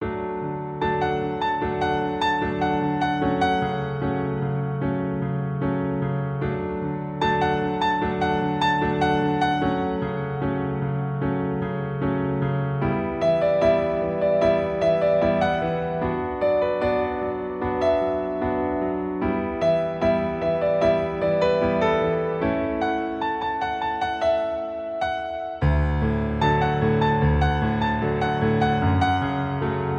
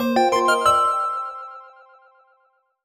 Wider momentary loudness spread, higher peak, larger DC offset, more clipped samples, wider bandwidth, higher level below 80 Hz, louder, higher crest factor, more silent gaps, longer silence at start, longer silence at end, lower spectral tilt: second, 6 LU vs 18 LU; about the same, -8 dBFS vs -6 dBFS; neither; neither; second, 8.4 kHz vs 19 kHz; first, -38 dBFS vs -58 dBFS; second, -23 LUFS vs -19 LUFS; about the same, 16 dB vs 16 dB; neither; about the same, 0 s vs 0 s; second, 0 s vs 1.15 s; first, -8 dB/octave vs -3 dB/octave